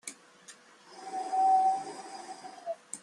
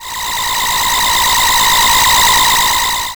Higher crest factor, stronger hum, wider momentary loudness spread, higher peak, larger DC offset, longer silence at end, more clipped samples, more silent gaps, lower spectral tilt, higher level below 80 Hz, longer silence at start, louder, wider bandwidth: first, 16 dB vs 6 dB; neither; first, 27 LU vs 7 LU; second, -18 dBFS vs -6 dBFS; second, under 0.1% vs 0.8%; about the same, 0.05 s vs 0.05 s; neither; neither; first, -1.5 dB/octave vs 0.5 dB/octave; second, -88 dBFS vs -32 dBFS; about the same, 0.05 s vs 0 s; second, -30 LUFS vs -10 LUFS; second, 12 kHz vs over 20 kHz